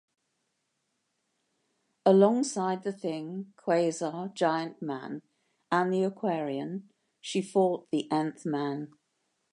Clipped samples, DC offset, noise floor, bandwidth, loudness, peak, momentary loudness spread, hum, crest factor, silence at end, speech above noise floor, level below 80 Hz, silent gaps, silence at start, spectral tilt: under 0.1%; under 0.1%; -79 dBFS; 11 kHz; -29 LUFS; -8 dBFS; 15 LU; none; 22 dB; 0.65 s; 50 dB; -84 dBFS; none; 2.05 s; -6 dB/octave